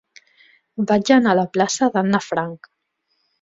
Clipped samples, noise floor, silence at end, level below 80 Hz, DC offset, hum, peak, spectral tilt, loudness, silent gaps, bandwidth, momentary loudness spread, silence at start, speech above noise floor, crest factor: under 0.1%; -71 dBFS; 0.85 s; -62 dBFS; under 0.1%; none; -2 dBFS; -5 dB/octave; -18 LUFS; none; 7.8 kHz; 12 LU; 0.8 s; 53 dB; 18 dB